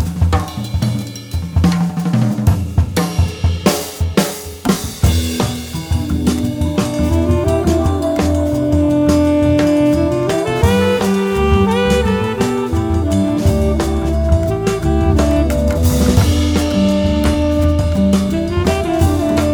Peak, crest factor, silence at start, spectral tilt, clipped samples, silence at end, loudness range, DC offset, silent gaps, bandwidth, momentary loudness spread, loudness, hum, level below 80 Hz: 0 dBFS; 14 dB; 0 s; -6.5 dB/octave; under 0.1%; 0 s; 3 LU; under 0.1%; none; over 20 kHz; 6 LU; -15 LUFS; none; -22 dBFS